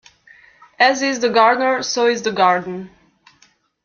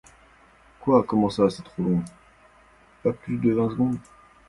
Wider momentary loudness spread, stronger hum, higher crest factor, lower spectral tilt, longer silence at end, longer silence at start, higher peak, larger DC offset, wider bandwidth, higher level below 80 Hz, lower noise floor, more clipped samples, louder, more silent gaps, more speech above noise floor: about the same, 7 LU vs 9 LU; neither; about the same, 18 dB vs 20 dB; second, -3 dB/octave vs -8 dB/octave; first, 0.95 s vs 0.5 s; about the same, 0.8 s vs 0.85 s; first, -2 dBFS vs -6 dBFS; neither; second, 7.2 kHz vs 11.5 kHz; second, -64 dBFS vs -54 dBFS; about the same, -57 dBFS vs -55 dBFS; neither; first, -16 LUFS vs -24 LUFS; neither; first, 40 dB vs 32 dB